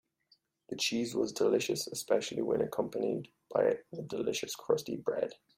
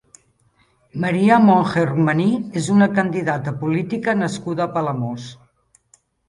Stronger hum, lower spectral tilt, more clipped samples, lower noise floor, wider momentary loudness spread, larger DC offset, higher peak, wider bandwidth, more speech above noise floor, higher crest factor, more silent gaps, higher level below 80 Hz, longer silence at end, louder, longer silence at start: neither; second, -4 dB/octave vs -7 dB/octave; neither; first, -71 dBFS vs -60 dBFS; second, 7 LU vs 12 LU; neither; second, -14 dBFS vs -2 dBFS; first, 16 kHz vs 11 kHz; second, 38 dB vs 42 dB; about the same, 18 dB vs 18 dB; neither; second, -72 dBFS vs -58 dBFS; second, 0.2 s vs 0.95 s; second, -33 LUFS vs -19 LUFS; second, 0.7 s vs 0.95 s